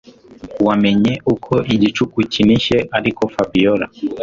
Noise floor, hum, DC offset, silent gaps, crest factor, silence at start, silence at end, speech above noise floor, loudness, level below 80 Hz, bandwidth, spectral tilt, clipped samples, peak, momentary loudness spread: -37 dBFS; none; under 0.1%; none; 14 dB; 0.45 s; 0 s; 21 dB; -16 LUFS; -44 dBFS; 7.6 kHz; -6.5 dB/octave; under 0.1%; -2 dBFS; 6 LU